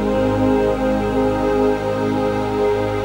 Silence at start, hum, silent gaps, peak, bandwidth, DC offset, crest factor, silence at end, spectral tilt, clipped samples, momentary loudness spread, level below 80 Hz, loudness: 0 s; none; none; -6 dBFS; 16.5 kHz; under 0.1%; 12 dB; 0 s; -7 dB/octave; under 0.1%; 3 LU; -34 dBFS; -18 LUFS